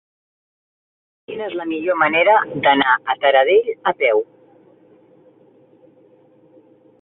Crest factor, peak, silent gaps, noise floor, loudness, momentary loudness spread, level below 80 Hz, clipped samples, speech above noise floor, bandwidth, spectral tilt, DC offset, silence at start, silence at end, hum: 18 dB; -2 dBFS; none; -52 dBFS; -16 LUFS; 13 LU; -66 dBFS; under 0.1%; 35 dB; 4.1 kHz; -8.5 dB/octave; under 0.1%; 1.3 s; 2.8 s; none